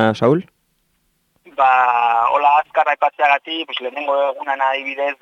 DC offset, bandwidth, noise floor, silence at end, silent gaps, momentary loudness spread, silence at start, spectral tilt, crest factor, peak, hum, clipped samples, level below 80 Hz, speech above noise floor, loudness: under 0.1%; 7.8 kHz; -65 dBFS; 0.1 s; none; 9 LU; 0 s; -6 dB/octave; 16 dB; -2 dBFS; none; under 0.1%; -66 dBFS; 48 dB; -17 LUFS